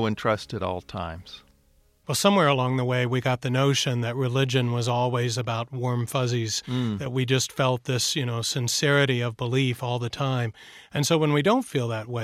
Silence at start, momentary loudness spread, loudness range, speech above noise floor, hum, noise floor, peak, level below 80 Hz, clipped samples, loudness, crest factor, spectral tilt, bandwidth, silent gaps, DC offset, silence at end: 0 s; 9 LU; 2 LU; 37 dB; none; -62 dBFS; -6 dBFS; -58 dBFS; under 0.1%; -25 LUFS; 18 dB; -4.5 dB/octave; 15 kHz; none; under 0.1%; 0 s